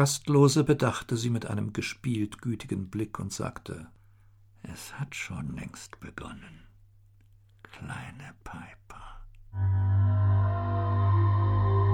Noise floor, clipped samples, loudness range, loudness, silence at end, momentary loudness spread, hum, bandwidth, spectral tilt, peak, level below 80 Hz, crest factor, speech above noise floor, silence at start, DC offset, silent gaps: -58 dBFS; under 0.1%; 17 LU; -28 LUFS; 0 s; 21 LU; none; 15 kHz; -6 dB/octave; -8 dBFS; -50 dBFS; 20 dB; 28 dB; 0 s; under 0.1%; none